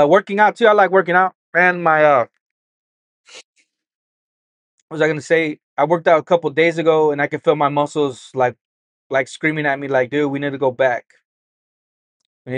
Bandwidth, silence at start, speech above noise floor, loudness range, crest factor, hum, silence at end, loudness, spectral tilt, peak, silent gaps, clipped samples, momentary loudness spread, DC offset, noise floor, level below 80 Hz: 10 kHz; 0 s; over 74 dB; 7 LU; 18 dB; none; 0 s; -17 LUFS; -6 dB/octave; 0 dBFS; 1.35-1.53 s, 2.41-3.24 s, 3.44-3.54 s, 3.95-4.88 s, 5.63-5.76 s, 8.61-9.10 s, 11.25-12.20 s, 12.26-12.45 s; under 0.1%; 8 LU; under 0.1%; under -90 dBFS; -72 dBFS